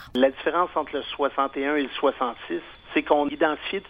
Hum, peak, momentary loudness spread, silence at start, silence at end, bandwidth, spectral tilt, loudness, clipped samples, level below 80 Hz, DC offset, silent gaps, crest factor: none; -6 dBFS; 8 LU; 0 s; 0 s; 5.8 kHz; -6 dB/octave; -25 LUFS; under 0.1%; -56 dBFS; under 0.1%; none; 20 dB